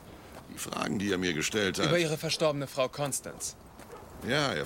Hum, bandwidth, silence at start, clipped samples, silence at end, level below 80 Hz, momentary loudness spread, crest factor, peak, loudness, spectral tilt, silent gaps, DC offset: none; 17 kHz; 0 s; under 0.1%; 0 s; -58 dBFS; 21 LU; 18 dB; -14 dBFS; -30 LUFS; -3.5 dB/octave; none; under 0.1%